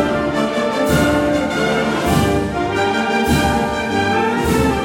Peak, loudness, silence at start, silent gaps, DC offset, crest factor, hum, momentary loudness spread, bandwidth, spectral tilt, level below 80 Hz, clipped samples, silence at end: -2 dBFS; -17 LUFS; 0 s; none; under 0.1%; 14 dB; none; 3 LU; 17 kHz; -5.5 dB/octave; -34 dBFS; under 0.1%; 0 s